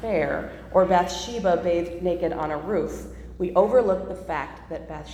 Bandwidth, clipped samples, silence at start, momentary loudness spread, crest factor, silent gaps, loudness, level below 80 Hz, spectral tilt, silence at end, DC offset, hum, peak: 14 kHz; under 0.1%; 0 s; 15 LU; 18 dB; none; -24 LUFS; -44 dBFS; -5.5 dB/octave; 0 s; under 0.1%; none; -6 dBFS